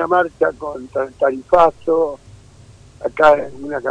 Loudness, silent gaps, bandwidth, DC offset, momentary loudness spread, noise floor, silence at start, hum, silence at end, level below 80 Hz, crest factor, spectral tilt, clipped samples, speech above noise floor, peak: -17 LUFS; none; 9.8 kHz; under 0.1%; 14 LU; -44 dBFS; 0 s; none; 0 s; -48 dBFS; 16 dB; -6 dB/octave; under 0.1%; 27 dB; -2 dBFS